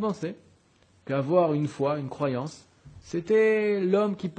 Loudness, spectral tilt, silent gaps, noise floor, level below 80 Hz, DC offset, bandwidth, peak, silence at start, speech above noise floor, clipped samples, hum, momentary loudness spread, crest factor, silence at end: -26 LUFS; -7.5 dB/octave; none; -62 dBFS; -66 dBFS; under 0.1%; 9.2 kHz; -10 dBFS; 0 s; 36 dB; under 0.1%; none; 13 LU; 18 dB; 0.05 s